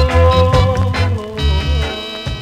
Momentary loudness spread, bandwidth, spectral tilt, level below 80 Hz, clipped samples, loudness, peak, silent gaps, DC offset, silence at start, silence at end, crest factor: 10 LU; 10 kHz; -6.5 dB/octave; -20 dBFS; under 0.1%; -15 LUFS; -4 dBFS; none; under 0.1%; 0 s; 0 s; 10 dB